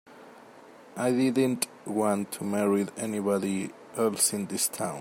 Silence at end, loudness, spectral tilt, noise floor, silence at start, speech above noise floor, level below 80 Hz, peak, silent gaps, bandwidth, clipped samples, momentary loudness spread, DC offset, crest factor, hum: 0 s; -28 LUFS; -4 dB/octave; -51 dBFS; 0.1 s; 23 dB; -74 dBFS; -10 dBFS; none; 16.5 kHz; under 0.1%; 7 LU; under 0.1%; 18 dB; none